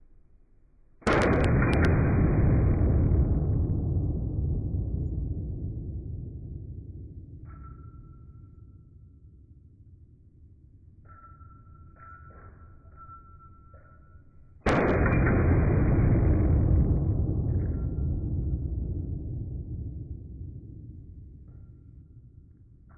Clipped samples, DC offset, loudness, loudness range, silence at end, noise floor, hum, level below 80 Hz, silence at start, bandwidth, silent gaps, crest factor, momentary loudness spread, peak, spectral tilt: under 0.1%; under 0.1%; -27 LUFS; 19 LU; 0.8 s; -58 dBFS; none; -34 dBFS; 1.05 s; 10 kHz; none; 16 dB; 24 LU; -12 dBFS; -9 dB/octave